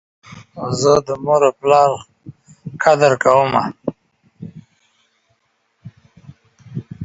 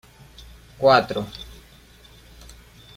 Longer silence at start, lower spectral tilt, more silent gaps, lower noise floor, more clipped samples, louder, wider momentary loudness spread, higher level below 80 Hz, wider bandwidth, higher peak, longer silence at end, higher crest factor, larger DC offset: second, 0.3 s vs 0.8 s; about the same, -5 dB/octave vs -5 dB/octave; neither; first, -65 dBFS vs -49 dBFS; neither; first, -15 LUFS vs -20 LUFS; about the same, 24 LU vs 23 LU; second, -54 dBFS vs -48 dBFS; second, 8 kHz vs 16 kHz; about the same, 0 dBFS vs -2 dBFS; second, 0 s vs 1.5 s; about the same, 18 dB vs 22 dB; neither